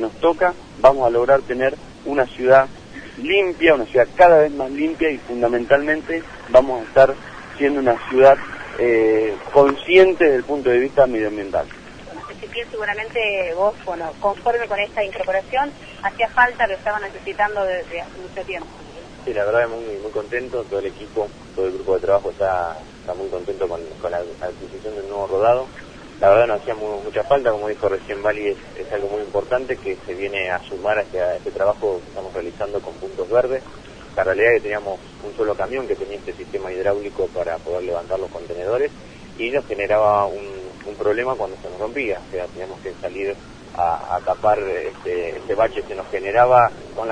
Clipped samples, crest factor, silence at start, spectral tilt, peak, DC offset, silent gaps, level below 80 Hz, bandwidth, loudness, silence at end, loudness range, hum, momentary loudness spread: under 0.1%; 20 dB; 0 s; -5.5 dB/octave; 0 dBFS; under 0.1%; none; -46 dBFS; 10 kHz; -20 LUFS; 0 s; 8 LU; none; 16 LU